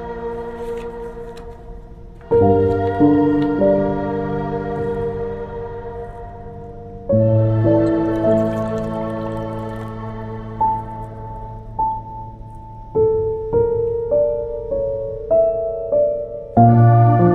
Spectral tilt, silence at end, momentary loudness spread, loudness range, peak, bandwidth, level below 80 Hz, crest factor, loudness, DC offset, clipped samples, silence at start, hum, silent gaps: -10.5 dB/octave; 0 s; 19 LU; 8 LU; 0 dBFS; 4.6 kHz; -38 dBFS; 18 dB; -18 LUFS; under 0.1%; under 0.1%; 0 s; none; none